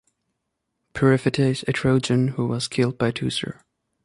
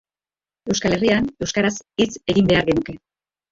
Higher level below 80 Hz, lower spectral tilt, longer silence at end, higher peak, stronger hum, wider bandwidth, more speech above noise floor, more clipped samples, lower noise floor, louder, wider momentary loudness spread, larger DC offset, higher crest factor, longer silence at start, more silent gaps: second, -52 dBFS vs -44 dBFS; about the same, -6 dB/octave vs -5 dB/octave; about the same, 0.55 s vs 0.55 s; about the same, -4 dBFS vs -4 dBFS; neither; first, 11.5 kHz vs 7.8 kHz; second, 57 dB vs over 71 dB; neither; second, -78 dBFS vs under -90 dBFS; about the same, -22 LUFS vs -20 LUFS; second, 7 LU vs 11 LU; neither; about the same, 18 dB vs 18 dB; first, 0.95 s vs 0.65 s; neither